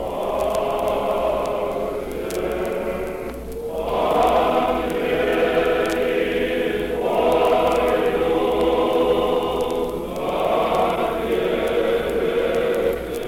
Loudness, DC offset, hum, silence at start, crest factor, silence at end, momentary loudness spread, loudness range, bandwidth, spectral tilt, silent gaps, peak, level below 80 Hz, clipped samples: -21 LUFS; under 0.1%; none; 0 s; 14 dB; 0 s; 8 LU; 4 LU; 17 kHz; -5 dB/octave; none; -6 dBFS; -40 dBFS; under 0.1%